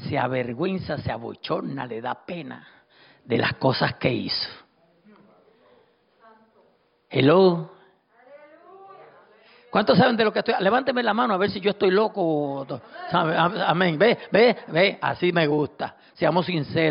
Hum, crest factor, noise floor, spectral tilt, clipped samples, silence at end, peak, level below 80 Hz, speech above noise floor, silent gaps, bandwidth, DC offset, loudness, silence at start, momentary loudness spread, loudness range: none; 18 dB; -63 dBFS; -10.5 dB/octave; under 0.1%; 0 s; -6 dBFS; -60 dBFS; 41 dB; none; 5.4 kHz; under 0.1%; -22 LUFS; 0 s; 14 LU; 7 LU